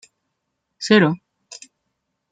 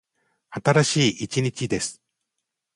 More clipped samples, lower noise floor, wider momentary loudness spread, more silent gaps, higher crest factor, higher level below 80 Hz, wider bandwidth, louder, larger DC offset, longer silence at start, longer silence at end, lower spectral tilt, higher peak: neither; second, -76 dBFS vs -82 dBFS; first, 25 LU vs 10 LU; neither; about the same, 22 dB vs 20 dB; second, -66 dBFS vs -58 dBFS; second, 9.2 kHz vs 11.5 kHz; first, -17 LUFS vs -23 LUFS; neither; first, 0.8 s vs 0.5 s; first, 1.15 s vs 0.8 s; about the same, -5.5 dB/octave vs -4.5 dB/octave; about the same, -2 dBFS vs -4 dBFS